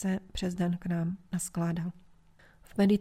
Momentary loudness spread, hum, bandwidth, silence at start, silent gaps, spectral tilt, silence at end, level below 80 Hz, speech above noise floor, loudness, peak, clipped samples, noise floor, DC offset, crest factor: 7 LU; none; 15 kHz; 0 s; none; -6 dB/octave; 0 s; -52 dBFS; 29 dB; -33 LUFS; -14 dBFS; under 0.1%; -59 dBFS; under 0.1%; 16 dB